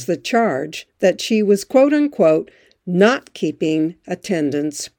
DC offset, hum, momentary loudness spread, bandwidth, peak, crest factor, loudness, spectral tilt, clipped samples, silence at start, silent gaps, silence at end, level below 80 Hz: under 0.1%; none; 10 LU; over 20 kHz; -2 dBFS; 16 dB; -18 LUFS; -5.5 dB/octave; under 0.1%; 0 s; none; 0.1 s; -66 dBFS